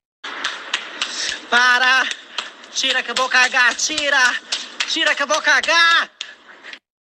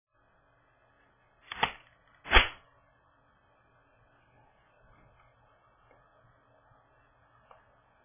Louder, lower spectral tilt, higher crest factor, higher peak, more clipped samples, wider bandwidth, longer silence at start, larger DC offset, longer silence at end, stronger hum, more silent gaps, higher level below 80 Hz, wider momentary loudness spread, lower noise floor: first, -16 LUFS vs -27 LUFS; second, 1.5 dB/octave vs -0.5 dB/octave; second, 16 dB vs 32 dB; first, -2 dBFS vs -6 dBFS; neither; first, 13 kHz vs 3.7 kHz; second, 0.25 s vs 1.55 s; neither; second, 0.3 s vs 5.55 s; neither; neither; second, -66 dBFS vs -44 dBFS; second, 14 LU vs 28 LU; second, -40 dBFS vs -68 dBFS